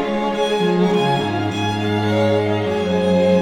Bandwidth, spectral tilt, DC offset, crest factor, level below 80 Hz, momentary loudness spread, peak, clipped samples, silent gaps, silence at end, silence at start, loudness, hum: 13 kHz; -6.5 dB/octave; under 0.1%; 12 dB; -50 dBFS; 4 LU; -4 dBFS; under 0.1%; none; 0 s; 0 s; -18 LUFS; none